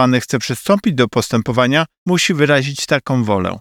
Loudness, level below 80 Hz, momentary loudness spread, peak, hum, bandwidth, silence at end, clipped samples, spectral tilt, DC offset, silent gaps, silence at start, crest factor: -16 LUFS; -50 dBFS; 4 LU; 0 dBFS; none; 19 kHz; 0 s; under 0.1%; -5 dB/octave; under 0.1%; 1.98-2.06 s; 0 s; 14 dB